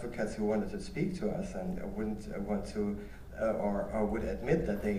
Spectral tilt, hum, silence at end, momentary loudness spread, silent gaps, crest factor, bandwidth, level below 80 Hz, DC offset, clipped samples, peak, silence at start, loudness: -7.5 dB/octave; none; 0 s; 7 LU; none; 18 dB; 15.5 kHz; -46 dBFS; under 0.1%; under 0.1%; -16 dBFS; 0 s; -35 LUFS